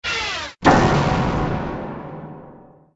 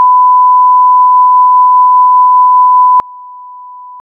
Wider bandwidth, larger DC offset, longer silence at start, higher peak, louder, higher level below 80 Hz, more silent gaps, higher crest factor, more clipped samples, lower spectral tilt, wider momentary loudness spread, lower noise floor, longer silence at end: first, 8 kHz vs 1.7 kHz; neither; about the same, 0.05 s vs 0 s; about the same, 0 dBFS vs -2 dBFS; second, -19 LUFS vs -5 LUFS; first, -34 dBFS vs -62 dBFS; neither; first, 20 dB vs 4 dB; neither; about the same, -5.5 dB/octave vs -5.5 dB/octave; first, 20 LU vs 0 LU; first, -45 dBFS vs -29 dBFS; first, 0.35 s vs 0 s